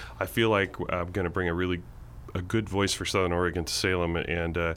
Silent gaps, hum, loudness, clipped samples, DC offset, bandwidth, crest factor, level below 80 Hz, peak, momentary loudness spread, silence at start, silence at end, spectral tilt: none; none; -28 LUFS; under 0.1%; under 0.1%; 17 kHz; 18 dB; -44 dBFS; -10 dBFS; 9 LU; 0 s; 0 s; -4.5 dB/octave